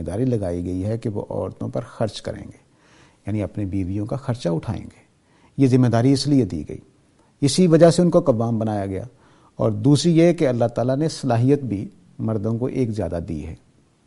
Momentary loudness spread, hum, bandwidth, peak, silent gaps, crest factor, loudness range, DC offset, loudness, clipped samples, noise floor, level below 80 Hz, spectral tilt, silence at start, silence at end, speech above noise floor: 16 LU; none; 11.5 kHz; -2 dBFS; none; 18 dB; 10 LU; under 0.1%; -21 LUFS; under 0.1%; -57 dBFS; -48 dBFS; -7 dB/octave; 0 s; 0.5 s; 37 dB